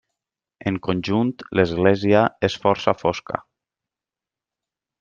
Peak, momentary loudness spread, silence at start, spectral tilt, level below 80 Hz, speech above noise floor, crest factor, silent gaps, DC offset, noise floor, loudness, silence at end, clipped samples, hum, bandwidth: -2 dBFS; 11 LU; 0.65 s; -6.5 dB/octave; -56 dBFS; 69 dB; 20 dB; none; under 0.1%; -89 dBFS; -21 LUFS; 1.6 s; under 0.1%; none; 7.4 kHz